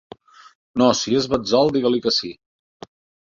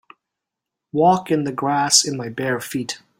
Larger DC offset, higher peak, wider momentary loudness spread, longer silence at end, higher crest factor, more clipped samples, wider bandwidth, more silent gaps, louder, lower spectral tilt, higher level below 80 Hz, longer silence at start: neither; about the same, -2 dBFS vs 0 dBFS; second, 6 LU vs 12 LU; first, 0.9 s vs 0.25 s; about the same, 20 dB vs 20 dB; neither; second, 7.6 kHz vs 16.5 kHz; neither; about the same, -19 LUFS vs -19 LUFS; first, -4.5 dB/octave vs -3 dB/octave; first, -54 dBFS vs -62 dBFS; second, 0.75 s vs 0.95 s